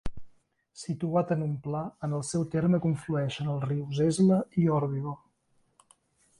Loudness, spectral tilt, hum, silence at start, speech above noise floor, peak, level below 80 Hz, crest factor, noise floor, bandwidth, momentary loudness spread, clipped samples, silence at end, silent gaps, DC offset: -29 LUFS; -7 dB/octave; none; 0.05 s; 42 dB; -14 dBFS; -54 dBFS; 16 dB; -70 dBFS; 11.5 kHz; 12 LU; under 0.1%; 1.25 s; none; under 0.1%